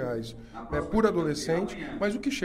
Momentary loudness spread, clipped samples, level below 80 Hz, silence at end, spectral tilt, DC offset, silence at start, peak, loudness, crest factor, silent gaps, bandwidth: 11 LU; under 0.1%; -46 dBFS; 0 s; -5.5 dB/octave; under 0.1%; 0 s; -10 dBFS; -29 LUFS; 18 dB; none; 15.5 kHz